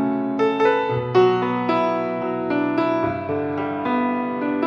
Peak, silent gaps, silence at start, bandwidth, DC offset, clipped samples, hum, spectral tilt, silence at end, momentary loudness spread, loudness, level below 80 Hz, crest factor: -6 dBFS; none; 0 s; 7 kHz; under 0.1%; under 0.1%; none; -8 dB/octave; 0 s; 7 LU; -21 LUFS; -58 dBFS; 16 dB